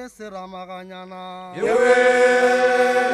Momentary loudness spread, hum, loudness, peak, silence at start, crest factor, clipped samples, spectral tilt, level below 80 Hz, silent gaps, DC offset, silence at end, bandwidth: 20 LU; none; -16 LUFS; -2 dBFS; 0 s; 16 dB; under 0.1%; -3.5 dB/octave; -60 dBFS; none; under 0.1%; 0 s; 12.5 kHz